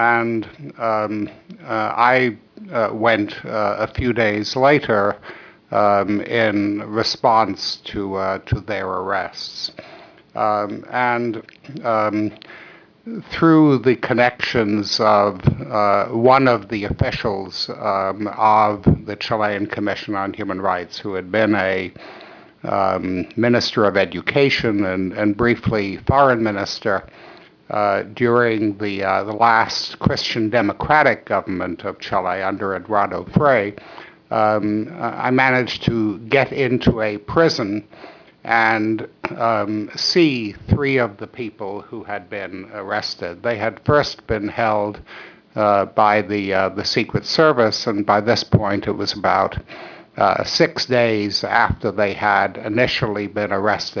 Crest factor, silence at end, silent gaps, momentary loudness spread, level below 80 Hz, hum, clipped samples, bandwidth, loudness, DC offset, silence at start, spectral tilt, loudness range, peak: 18 dB; 0 s; none; 12 LU; -44 dBFS; none; under 0.1%; 5.4 kHz; -19 LUFS; under 0.1%; 0 s; -6 dB/octave; 5 LU; -2 dBFS